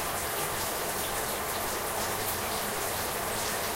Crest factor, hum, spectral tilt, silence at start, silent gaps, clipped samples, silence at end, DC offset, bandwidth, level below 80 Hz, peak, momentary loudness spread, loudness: 14 dB; none; -2 dB/octave; 0 s; none; under 0.1%; 0 s; under 0.1%; 16 kHz; -52 dBFS; -18 dBFS; 1 LU; -30 LUFS